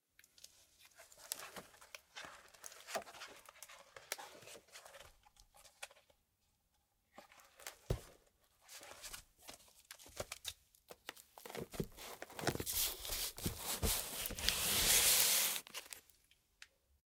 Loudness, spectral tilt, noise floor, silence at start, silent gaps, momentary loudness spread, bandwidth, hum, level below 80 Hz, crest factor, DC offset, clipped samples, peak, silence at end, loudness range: -37 LUFS; -1 dB/octave; -81 dBFS; 0.85 s; none; 25 LU; 17.5 kHz; none; -58 dBFS; 34 dB; under 0.1%; under 0.1%; -10 dBFS; 1.05 s; 20 LU